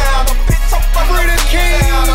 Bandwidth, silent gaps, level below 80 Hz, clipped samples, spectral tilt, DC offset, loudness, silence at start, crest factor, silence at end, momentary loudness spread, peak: 16.5 kHz; none; -10 dBFS; under 0.1%; -3.5 dB/octave; under 0.1%; -14 LUFS; 0 s; 8 dB; 0 s; 3 LU; -2 dBFS